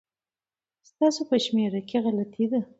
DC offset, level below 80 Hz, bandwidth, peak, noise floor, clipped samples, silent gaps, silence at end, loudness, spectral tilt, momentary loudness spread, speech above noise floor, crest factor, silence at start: under 0.1%; -74 dBFS; 8 kHz; -10 dBFS; under -90 dBFS; under 0.1%; none; 0.15 s; -26 LUFS; -5.5 dB/octave; 4 LU; over 65 dB; 16 dB; 1 s